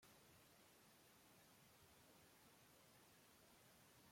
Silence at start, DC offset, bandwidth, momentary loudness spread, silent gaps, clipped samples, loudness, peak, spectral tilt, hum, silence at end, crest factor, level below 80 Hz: 0 s; under 0.1%; 16.5 kHz; 1 LU; none; under 0.1%; -70 LUFS; -56 dBFS; -3 dB/octave; none; 0 s; 14 dB; -90 dBFS